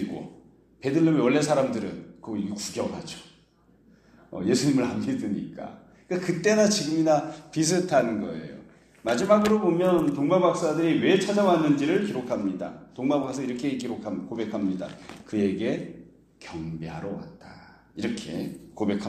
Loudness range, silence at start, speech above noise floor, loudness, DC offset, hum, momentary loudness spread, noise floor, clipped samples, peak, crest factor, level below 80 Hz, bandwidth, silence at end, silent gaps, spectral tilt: 9 LU; 0 s; 35 dB; -25 LUFS; under 0.1%; none; 17 LU; -60 dBFS; under 0.1%; -6 dBFS; 20 dB; -62 dBFS; 14.5 kHz; 0 s; none; -5.5 dB/octave